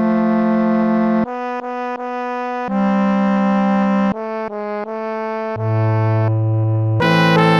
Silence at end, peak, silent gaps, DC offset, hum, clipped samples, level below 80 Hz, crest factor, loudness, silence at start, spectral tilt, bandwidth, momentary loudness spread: 0 s; 0 dBFS; none; under 0.1%; none; under 0.1%; -54 dBFS; 16 dB; -18 LUFS; 0 s; -8 dB/octave; 7 kHz; 9 LU